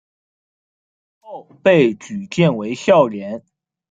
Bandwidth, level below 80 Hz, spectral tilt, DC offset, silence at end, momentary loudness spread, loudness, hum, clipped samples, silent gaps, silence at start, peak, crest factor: 9 kHz; -62 dBFS; -6.5 dB/octave; under 0.1%; 0.5 s; 22 LU; -16 LUFS; none; under 0.1%; none; 1.25 s; -2 dBFS; 18 dB